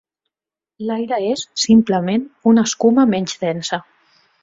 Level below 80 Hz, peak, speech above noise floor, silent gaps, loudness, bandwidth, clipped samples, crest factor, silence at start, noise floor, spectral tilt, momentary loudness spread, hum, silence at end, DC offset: -56 dBFS; -2 dBFS; 73 dB; none; -17 LUFS; 7.8 kHz; under 0.1%; 16 dB; 0.8 s; -90 dBFS; -5 dB/octave; 11 LU; none; 0.6 s; under 0.1%